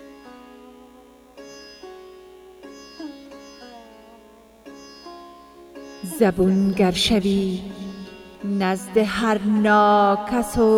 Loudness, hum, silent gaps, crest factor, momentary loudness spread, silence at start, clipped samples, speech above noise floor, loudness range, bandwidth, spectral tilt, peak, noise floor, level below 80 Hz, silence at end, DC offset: -20 LUFS; 60 Hz at -55 dBFS; none; 18 dB; 25 LU; 0 s; under 0.1%; 30 dB; 21 LU; 16 kHz; -5.5 dB/octave; -4 dBFS; -49 dBFS; -46 dBFS; 0 s; under 0.1%